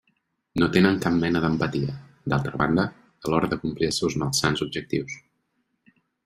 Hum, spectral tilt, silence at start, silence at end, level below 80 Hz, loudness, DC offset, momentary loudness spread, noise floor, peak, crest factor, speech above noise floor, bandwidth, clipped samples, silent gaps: none; -5 dB/octave; 0.55 s; 1.05 s; -52 dBFS; -24 LUFS; under 0.1%; 12 LU; -73 dBFS; -4 dBFS; 22 dB; 50 dB; 15.5 kHz; under 0.1%; none